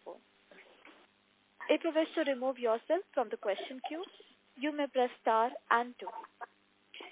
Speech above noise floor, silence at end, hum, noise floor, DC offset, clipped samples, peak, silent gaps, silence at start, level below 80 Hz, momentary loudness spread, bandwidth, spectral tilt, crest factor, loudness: 36 dB; 0 s; none; -70 dBFS; under 0.1%; under 0.1%; -14 dBFS; none; 0.05 s; under -90 dBFS; 19 LU; 4 kHz; 0 dB/octave; 22 dB; -34 LUFS